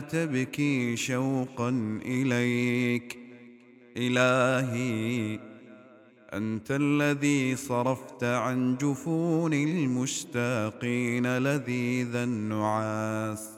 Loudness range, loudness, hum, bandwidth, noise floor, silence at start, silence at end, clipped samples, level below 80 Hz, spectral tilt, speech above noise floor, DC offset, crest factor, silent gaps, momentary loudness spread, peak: 2 LU; -28 LUFS; none; 16 kHz; -54 dBFS; 0 s; 0 s; under 0.1%; -70 dBFS; -5.5 dB/octave; 26 dB; under 0.1%; 18 dB; none; 7 LU; -10 dBFS